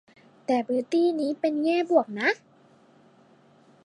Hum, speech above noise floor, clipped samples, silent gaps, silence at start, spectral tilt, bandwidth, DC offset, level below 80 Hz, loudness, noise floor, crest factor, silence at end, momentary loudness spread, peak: none; 33 dB; under 0.1%; none; 0.5 s; -5 dB/octave; 11 kHz; under 0.1%; -86 dBFS; -25 LUFS; -58 dBFS; 20 dB; 1.5 s; 5 LU; -8 dBFS